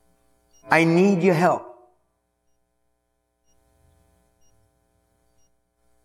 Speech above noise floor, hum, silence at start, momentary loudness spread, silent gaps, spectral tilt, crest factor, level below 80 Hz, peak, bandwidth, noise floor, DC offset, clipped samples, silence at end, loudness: 55 dB; none; 0.7 s; 5 LU; none; -7 dB/octave; 26 dB; -68 dBFS; 0 dBFS; 13.5 kHz; -73 dBFS; under 0.1%; under 0.1%; 4.35 s; -19 LUFS